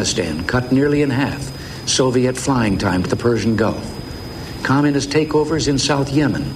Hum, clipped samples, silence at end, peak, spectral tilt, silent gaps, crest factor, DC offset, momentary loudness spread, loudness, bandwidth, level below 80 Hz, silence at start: none; under 0.1%; 0 s; -2 dBFS; -5 dB/octave; none; 16 dB; under 0.1%; 11 LU; -18 LUFS; 15.5 kHz; -38 dBFS; 0 s